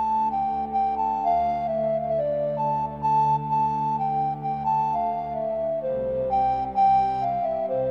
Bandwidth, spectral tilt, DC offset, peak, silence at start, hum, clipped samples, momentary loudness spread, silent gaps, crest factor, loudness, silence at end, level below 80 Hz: 6.6 kHz; -8.5 dB/octave; 0.1%; -12 dBFS; 0 s; none; under 0.1%; 5 LU; none; 12 dB; -24 LUFS; 0 s; -52 dBFS